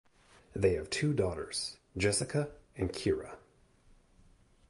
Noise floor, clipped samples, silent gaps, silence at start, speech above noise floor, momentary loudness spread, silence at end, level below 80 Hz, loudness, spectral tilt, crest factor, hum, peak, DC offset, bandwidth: -64 dBFS; under 0.1%; none; 0.55 s; 32 dB; 11 LU; 1.3 s; -52 dBFS; -33 LUFS; -4.5 dB/octave; 20 dB; none; -16 dBFS; under 0.1%; 11.5 kHz